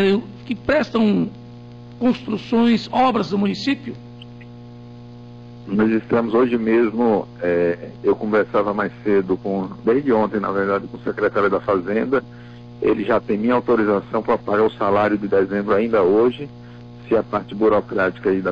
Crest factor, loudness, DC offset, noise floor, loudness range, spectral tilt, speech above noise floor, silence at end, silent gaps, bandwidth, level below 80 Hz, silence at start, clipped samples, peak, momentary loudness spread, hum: 10 dB; -19 LUFS; 0.2%; -38 dBFS; 3 LU; -7.5 dB/octave; 20 dB; 0 s; none; 7.4 kHz; -52 dBFS; 0 s; under 0.1%; -8 dBFS; 22 LU; 60 Hz at -40 dBFS